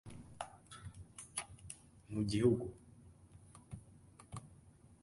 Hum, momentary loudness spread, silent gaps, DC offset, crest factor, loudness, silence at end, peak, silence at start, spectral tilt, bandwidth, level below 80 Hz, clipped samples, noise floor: none; 28 LU; none; under 0.1%; 24 dB; -40 LUFS; 0.3 s; -20 dBFS; 0.05 s; -6 dB/octave; 11.5 kHz; -62 dBFS; under 0.1%; -63 dBFS